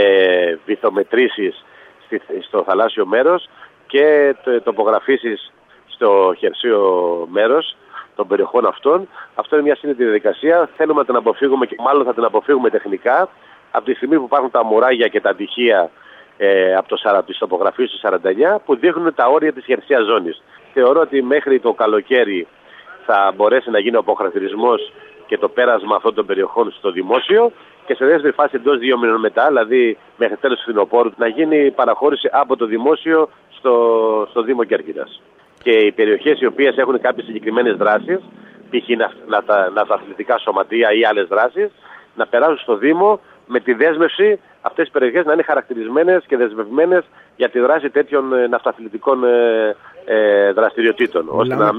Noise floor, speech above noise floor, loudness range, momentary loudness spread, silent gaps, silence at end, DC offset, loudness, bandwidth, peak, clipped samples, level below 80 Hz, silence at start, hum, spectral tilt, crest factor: -40 dBFS; 25 dB; 2 LU; 8 LU; none; 0 s; under 0.1%; -16 LUFS; 4.1 kHz; -2 dBFS; under 0.1%; -70 dBFS; 0 s; none; -7 dB/octave; 14 dB